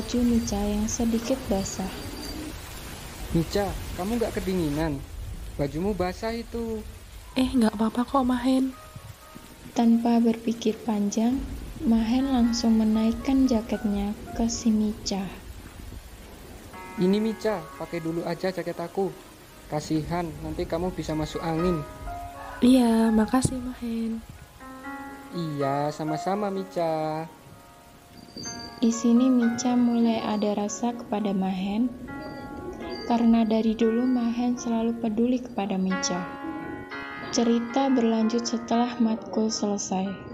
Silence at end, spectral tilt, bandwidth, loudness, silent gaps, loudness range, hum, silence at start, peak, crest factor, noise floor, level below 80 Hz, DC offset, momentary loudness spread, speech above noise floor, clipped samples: 0 s; -5.5 dB/octave; 16 kHz; -26 LUFS; none; 6 LU; none; 0 s; -10 dBFS; 16 dB; -50 dBFS; -44 dBFS; under 0.1%; 16 LU; 25 dB; under 0.1%